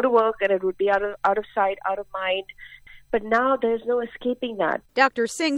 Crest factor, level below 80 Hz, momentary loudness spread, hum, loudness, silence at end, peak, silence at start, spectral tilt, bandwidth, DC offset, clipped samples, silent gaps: 20 dB; -56 dBFS; 8 LU; none; -23 LUFS; 0 s; -4 dBFS; 0 s; -3.5 dB/octave; 12.5 kHz; under 0.1%; under 0.1%; none